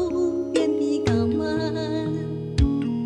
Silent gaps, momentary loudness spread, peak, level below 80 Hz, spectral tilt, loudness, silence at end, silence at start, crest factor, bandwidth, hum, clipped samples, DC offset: none; 5 LU; -8 dBFS; -34 dBFS; -7 dB/octave; -24 LUFS; 0 s; 0 s; 16 dB; 11 kHz; none; under 0.1%; under 0.1%